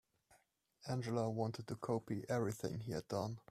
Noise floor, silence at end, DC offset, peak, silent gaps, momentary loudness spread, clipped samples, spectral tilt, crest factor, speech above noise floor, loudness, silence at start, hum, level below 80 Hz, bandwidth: -75 dBFS; 0.1 s; under 0.1%; -24 dBFS; none; 6 LU; under 0.1%; -6.5 dB/octave; 18 dB; 34 dB; -42 LUFS; 0.3 s; none; -72 dBFS; 14 kHz